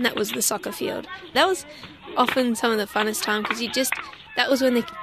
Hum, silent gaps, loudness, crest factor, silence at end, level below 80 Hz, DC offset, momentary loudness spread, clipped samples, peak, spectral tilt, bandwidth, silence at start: none; none; -23 LUFS; 20 dB; 0 s; -60 dBFS; under 0.1%; 9 LU; under 0.1%; -4 dBFS; -2 dB/octave; 14.5 kHz; 0 s